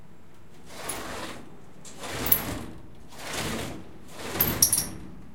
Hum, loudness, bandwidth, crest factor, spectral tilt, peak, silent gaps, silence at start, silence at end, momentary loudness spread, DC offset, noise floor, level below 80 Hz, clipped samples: none; -27 LUFS; 17 kHz; 30 dB; -2 dB/octave; -2 dBFS; none; 0 s; 0 s; 25 LU; 0.9%; -53 dBFS; -50 dBFS; under 0.1%